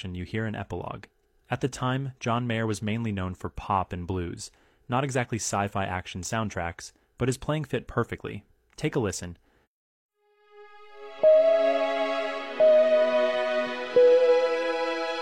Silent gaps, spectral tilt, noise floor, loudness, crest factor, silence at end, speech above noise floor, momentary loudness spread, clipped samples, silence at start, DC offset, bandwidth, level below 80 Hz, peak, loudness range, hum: 9.67-10.09 s; -5.5 dB/octave; -58 dBFS; -26 LUFS; 16 dB; 0 s; 28 dB; 17 LU; under 0.1%; 0 s; under 0.1%; 12.5 kHz; -54 dBFS; -10 dBFS; 9 LU; none